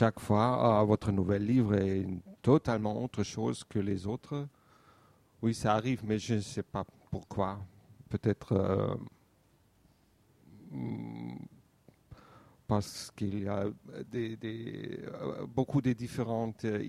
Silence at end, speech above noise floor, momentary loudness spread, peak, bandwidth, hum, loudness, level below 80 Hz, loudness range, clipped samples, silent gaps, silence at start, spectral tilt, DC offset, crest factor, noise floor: 0 s; 36 dB; 14 LU; -12 dBFS; 14 kHz; none; -33 LUFS; -60 dBFS; 11 LU; under 0.1%; none; 0 s; -7 dB/octave; under 0.1%; 20 dB; -67 dBFS